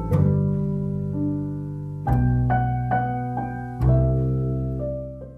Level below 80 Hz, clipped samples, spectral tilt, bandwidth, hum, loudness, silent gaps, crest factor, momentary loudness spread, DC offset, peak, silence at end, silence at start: -32 dBFS; under 0.1%; -11 dB/octave; 3.2 kHz; none; -24 LUFS; none; 16 dB; 10 LU; under 0.1%; -8 dBFS; 0 s; 0 s